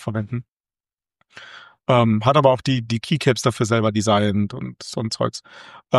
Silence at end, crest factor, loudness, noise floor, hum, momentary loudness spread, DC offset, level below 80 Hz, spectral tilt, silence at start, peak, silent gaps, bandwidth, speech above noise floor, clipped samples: 0 s; 20 dB; -20 LUFS; under -90 dBFS; none; 15 LU; under 0.1%; -56 dBFS; -6 dB/octave; 0 s; -2 dBFS; 0.52-0.64 s, 0.94-0.98 s; 12.5 kHz; over 70 dB; under 0.1%